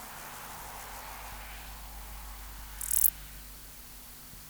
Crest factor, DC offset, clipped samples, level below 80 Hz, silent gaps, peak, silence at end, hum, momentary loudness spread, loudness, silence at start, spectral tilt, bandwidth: 34 dB; under 0.1%; under 0.1%; -50 dBFS; none; -4 dBFS; 0 s; none; 21 LU; -32 LUFS; 0 s; -1 dB/octave; over 20 kHz